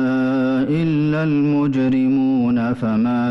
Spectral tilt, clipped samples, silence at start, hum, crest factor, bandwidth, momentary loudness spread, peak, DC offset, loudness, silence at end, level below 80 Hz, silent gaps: -9 dB/octave; under 0.1%; 0 s; none; 6 dB; 6 kHz; 2 LU; -10 dBFS; under 0.1%; -18 LUFS; 0 s; -52 dBFS; none